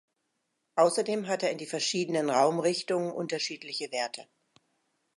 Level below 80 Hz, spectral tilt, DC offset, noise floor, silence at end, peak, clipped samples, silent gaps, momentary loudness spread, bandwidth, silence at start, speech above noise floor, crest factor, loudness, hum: -84 dBFS; -3.5 dB/octave; under 0.1%; -80 dBFS; 0.95 s; -10 dBFS; under 0.1%; none; 9 LU; 11.5 kHz; 0.75 s; 51 dB; 20 dB; -29 LUFS; none